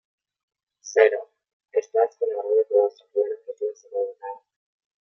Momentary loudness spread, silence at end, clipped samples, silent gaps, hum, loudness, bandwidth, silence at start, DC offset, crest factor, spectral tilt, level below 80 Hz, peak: 15 LU; 0.65 s; under 0.1%; 1.53-1.60 s; none; -24 LUFS; 6.8 kHz; 0.85 s; under 0.1%; 22 dB; -1 dB/octave; under -90 dBFS; -4 dBFS